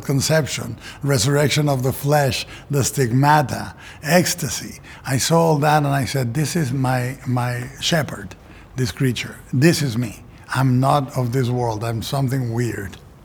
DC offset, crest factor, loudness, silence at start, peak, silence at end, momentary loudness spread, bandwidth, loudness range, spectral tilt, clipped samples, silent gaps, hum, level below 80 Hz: under 0.1%; 18 dB; -20 LUFS; 0 s; -2 dBFS; 0.25 s; 13 LU; over 20 kHz; 3 LU; -5 dB/octave; under 0.1%; none; none; -46 dBFS